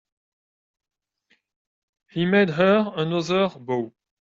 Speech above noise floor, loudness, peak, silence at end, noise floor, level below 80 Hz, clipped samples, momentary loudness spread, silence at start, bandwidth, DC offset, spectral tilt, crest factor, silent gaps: 46 dB; -22 LUFS; -6 dBFS; 0.3 s; -68 dBFS; -66 dBFS; under 0.1%; 10 LU; 2.15 s; 7.6 kHz; under 0.1%; -6.5 dB/octave; 18 dB; none